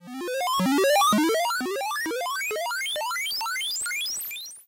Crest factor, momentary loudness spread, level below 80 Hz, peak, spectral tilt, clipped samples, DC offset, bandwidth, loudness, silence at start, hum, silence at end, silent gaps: 12 dB; 8 LU; -70 dBFS; -14 dBFS; -2.5 dB/octave; under 0.1%; under 0.1%; 17 kHz; -25 LUFS; 0 s; none; 0.05 s; none